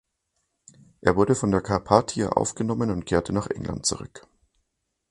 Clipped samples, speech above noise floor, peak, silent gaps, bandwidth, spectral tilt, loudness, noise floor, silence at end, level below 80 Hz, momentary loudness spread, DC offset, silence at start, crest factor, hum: under 0.1%; 54 dB; 0 dBFS; none; 11 kHz; -5 dB/octave; -24 LUFS; -78 dBFS; 0.9 s; -46 dBFS; 7 LU; under 0.1%; 1.05 s; 26 dB; none